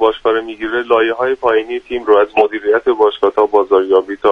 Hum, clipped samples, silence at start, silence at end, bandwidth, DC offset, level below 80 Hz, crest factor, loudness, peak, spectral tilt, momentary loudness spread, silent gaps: none; under 0.1%; 0 s; 0 s; 5 kHz; under 0.1%; -50 dBFS; 14 dB; -14 LUFS; 0 dBFS; -5.5 dB/octave; 7 LU; none